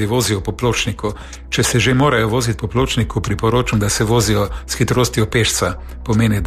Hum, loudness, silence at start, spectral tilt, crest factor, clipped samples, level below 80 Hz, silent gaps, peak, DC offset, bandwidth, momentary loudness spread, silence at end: none; -17 LUFS; 0 s; -4.5 dB/octave; 14 dB; under 0.1%; -30 dBFS; none; -4 dBFS; under 0.1%; 14 kHz; 8 LU; 0 s